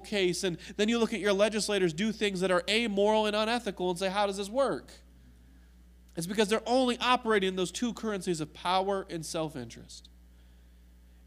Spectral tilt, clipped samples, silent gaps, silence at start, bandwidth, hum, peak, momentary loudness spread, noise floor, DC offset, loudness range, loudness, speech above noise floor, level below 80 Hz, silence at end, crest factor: -4 dB/octave; under 0.1%; none; 0 s; 15.5 kHz; none; -12 dBFS; 10 LU; -56 dBFS; under 0.1%; 5 LU; -29 LUFS; 26 dB; -56 dBFS; 1.25 s; 20 dB